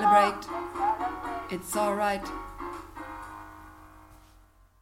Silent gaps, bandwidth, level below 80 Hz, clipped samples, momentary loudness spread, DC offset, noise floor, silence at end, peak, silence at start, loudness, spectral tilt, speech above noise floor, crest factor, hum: none; 16.5 kHz; -52 dBFS; under 0.1%; 18 LU; under 0.1%; -58 dBFS; 0.65 s; -8 dBFS; 0 s; -30 LUFS; -4 dB/octave; 29 dB; 22 dB; none